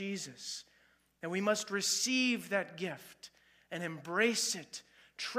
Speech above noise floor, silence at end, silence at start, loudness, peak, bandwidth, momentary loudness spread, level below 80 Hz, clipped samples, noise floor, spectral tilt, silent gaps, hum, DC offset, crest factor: 34 dB; 0 s; 0 s; -34 LUFS; -16 dBFS; 15.5 kHz; 18 LU; -84 dBFS; under 0.1%; -70 dBFS; -2.5 dB/octave; none; none; under 0.1%; 20 dB